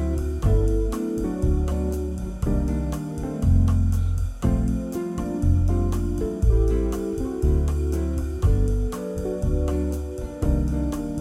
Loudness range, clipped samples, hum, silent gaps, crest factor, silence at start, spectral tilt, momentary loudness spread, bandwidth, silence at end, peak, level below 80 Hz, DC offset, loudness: 2 LU; under 0.1%; none; none; 14 dB; 0 s; -8.5 dB/octave; 7 LU; 14 kHz; 0 s; -8 dBFS; -24 dBFS; under 0.1%; -25 LUFS